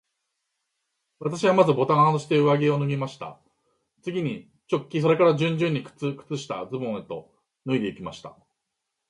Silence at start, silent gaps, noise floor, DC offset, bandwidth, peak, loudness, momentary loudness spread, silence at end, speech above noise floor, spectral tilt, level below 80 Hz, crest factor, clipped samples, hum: 1.2 s; none; -81 dBFS; under 0.1%; 11 kHz; -4 dBFS; -24 LUFS; 18 LU; 0.8 s; 58 dB; -7 dB/octave; -68 dBFS; 20 dB; under 0.1%; none